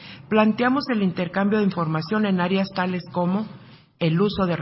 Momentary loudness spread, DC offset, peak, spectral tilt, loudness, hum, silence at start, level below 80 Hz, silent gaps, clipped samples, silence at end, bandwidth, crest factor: 6 LU; under 0.1%; -6 dBFS; -11 dB/octave; -22 LUFS; none; 0 s; -54 dBFS; none; under 0.1%; 0 s; 5.8 kHz; 16 dB